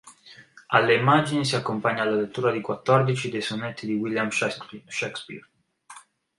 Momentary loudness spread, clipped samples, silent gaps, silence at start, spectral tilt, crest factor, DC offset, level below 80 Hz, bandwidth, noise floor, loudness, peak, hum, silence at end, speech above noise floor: 13 LU; under 0.1%; none; 0.05 s; -5 dB/octave; 22 dB; under 0.1%; -66 dBFS; 11.5 kHz; -50 dBFS; -24 LUFS; -4 dBFS; none; 0.4 s; 26 dB